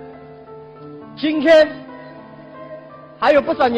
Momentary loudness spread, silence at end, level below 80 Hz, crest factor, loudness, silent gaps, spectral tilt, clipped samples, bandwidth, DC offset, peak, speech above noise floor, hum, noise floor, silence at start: 26 LU; 0 s; -54 dBFS; 14 dB; -15 LUFS; none; -5.5 dB/octave; under 0.1%; 8.8 kHz; under 0.1%; -4 dBFS; 24 dB; none; -38 dBFS; 0 s